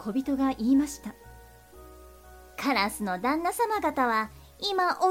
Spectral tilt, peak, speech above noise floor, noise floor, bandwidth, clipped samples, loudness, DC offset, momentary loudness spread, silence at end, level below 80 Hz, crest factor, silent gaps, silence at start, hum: -4 dB/octave; -12 dBFS; 24 dB; -50 dBFS; 16.5 kHz; under 0.1%; -27 LUFS; under 0.1%; 10 LU; 0 s; -54 dBFS; 16 dB; none; 0 s; none